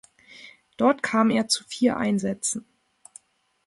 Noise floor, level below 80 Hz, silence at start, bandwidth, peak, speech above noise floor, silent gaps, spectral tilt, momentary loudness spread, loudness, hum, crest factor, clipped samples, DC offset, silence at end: -60 dBFS; -64 dBFS; 0.4 s; 11.5 kHz; -8 dBFS; 37 dB; none; -4 dB/octave; 20 LU; -24 LUFS; none; 18 dB; under 0.1%; under 0.1%; 1.05 s